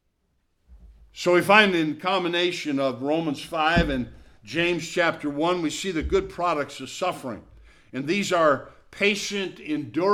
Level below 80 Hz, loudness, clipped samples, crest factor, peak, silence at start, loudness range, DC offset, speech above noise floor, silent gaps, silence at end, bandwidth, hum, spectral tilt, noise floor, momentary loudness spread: -44 dBFS; -24 LUFS; under 0.1%; 24 dB; -2 dBFS; 0.7 s; 5 LU; under 0.1%; 47 dB; none; 0 s; 15.5 kHz; none; -4.5 dB/octave; -71 dBFS; 10 LU